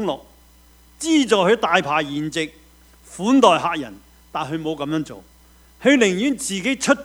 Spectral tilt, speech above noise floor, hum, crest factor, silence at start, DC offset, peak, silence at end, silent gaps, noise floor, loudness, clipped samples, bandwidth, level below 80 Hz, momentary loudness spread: -4 dB/octave; 32 dB; none; 20 dB; 0 s; under 0.1%; 0 dBFS; 0 s; none; -51 dBFS; -19 LUFS; under 0.1%; over 20 kHz; -54 dBFS; 14 LU